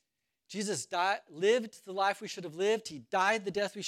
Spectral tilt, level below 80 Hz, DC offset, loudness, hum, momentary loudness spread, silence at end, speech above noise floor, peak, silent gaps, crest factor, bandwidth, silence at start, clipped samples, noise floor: -3 dB/octave; -80 dBFS; under 0.1%; -32 LUFS; none; 9 LU; 0 s; 45 dB; -14 dBFS; none; 18 dB; 14.5 kHz; 0.5 s; under 0.1%; -78 dBFS